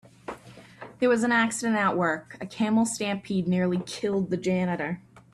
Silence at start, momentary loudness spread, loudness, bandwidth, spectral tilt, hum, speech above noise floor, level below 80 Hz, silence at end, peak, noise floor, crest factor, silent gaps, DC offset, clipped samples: 0.3 s; 18 LU; -26 LUFS; 13 kHz; -5 dB/octave; none; 22 dB; -64 dBFS; 0.15 s; -12 dBFS; -47 dBFS; 16 dB; none; under 0.1%; under 0.1%